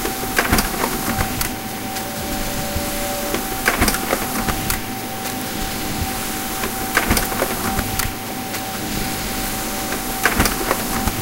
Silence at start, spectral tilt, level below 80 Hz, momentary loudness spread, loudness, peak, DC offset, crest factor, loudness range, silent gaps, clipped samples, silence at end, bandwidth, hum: 0 s; -3 dB/octave; -32 dBFS; 7 LU; -21 LUFS; 0 dBFS; under 0.1%; 22 dB; 1 LU; none; under 0.1%; 0 s; 17 kHz; none